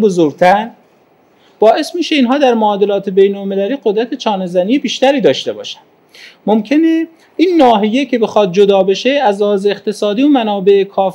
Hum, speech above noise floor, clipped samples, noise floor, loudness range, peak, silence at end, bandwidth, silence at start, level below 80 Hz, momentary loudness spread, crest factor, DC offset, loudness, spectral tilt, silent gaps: none; 38 dB; 0.1%; -50 dBFS; 3 LU; 0 dBFS; 0 s; 12 kHz; 0 s; -60 dBFS; 7 LU; 12 dB; under 0.1%; -12 LUFS; -5.5 dB/octave; none